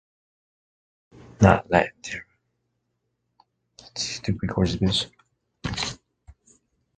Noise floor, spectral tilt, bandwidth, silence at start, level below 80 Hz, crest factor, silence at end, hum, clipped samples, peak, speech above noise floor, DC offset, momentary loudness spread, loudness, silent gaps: -76 dBFS; -5 dB/octave; 9.4 kHz; 1.4 s; -44 dBFS; 28 dB; 0.65 s; none; under 0.1%; 0 dBFS; 54 dB; under 0.1%; 17 LU; -24 LUFS; none